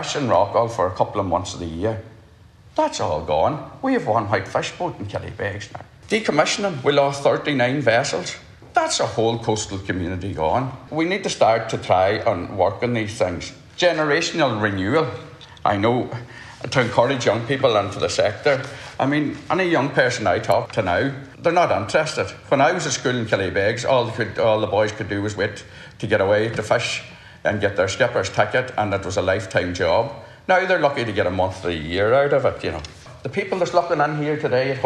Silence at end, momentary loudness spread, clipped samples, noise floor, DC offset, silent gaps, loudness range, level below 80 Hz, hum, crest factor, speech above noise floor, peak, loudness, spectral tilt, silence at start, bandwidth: 0 s; 10 LU; under 0.1%; -48 dBFS; under 0.1%; none; 3 LU; -50 dBFS; none; 18 dB; 27 dB; -2 dBFS; -21 LUFS; -4.5 dB/octave; 0 s; 11.5 kHz